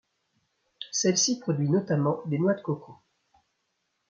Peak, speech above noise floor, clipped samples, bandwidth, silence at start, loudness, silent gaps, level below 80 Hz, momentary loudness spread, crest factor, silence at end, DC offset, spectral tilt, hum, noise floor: -12 dBFS; 51 dB; under 0.1%; 8.8 kHz; 0.8 s; -26 LUFS; none; -72 dBFS; 11 LU; 18 dB; 1.15 s; under 0.1%; -4.5 dB/octave; none; -77 dBFS